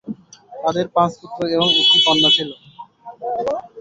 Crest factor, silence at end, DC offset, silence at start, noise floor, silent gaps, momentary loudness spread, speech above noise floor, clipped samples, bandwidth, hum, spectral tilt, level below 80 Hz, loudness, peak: 16 dB; 0 s; under 0.1%; 0.05 s; -39 dBFS; none; 19 LU; 22 dB; under 0.1%; 8 kHz; none; -4 dB/octave; -58 dBFS; -16 LUFS; -2 dBFS